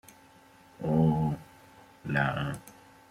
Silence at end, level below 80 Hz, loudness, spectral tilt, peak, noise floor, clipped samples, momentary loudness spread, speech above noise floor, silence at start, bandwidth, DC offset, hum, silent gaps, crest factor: 0.4 s; -56 dBFS; -30 LUFS; -7.5 dB/octave; -12 dBFS; -57 dBFS; under 0.1%; 15 LU; 30 dB; 0.8 s; 14 kHz; under 0.1%; none; none; 20 dB